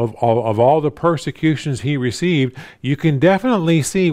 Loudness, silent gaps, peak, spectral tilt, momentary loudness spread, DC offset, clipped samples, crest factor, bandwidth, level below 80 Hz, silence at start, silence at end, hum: -17 LUFS; none; -2 dBFS; -6.5 dB/octave; 7 LU; under 0.1%; under 0.1%; 14 dB; 15.5 kHz; -50 dBFS; 0 s; 0 s; none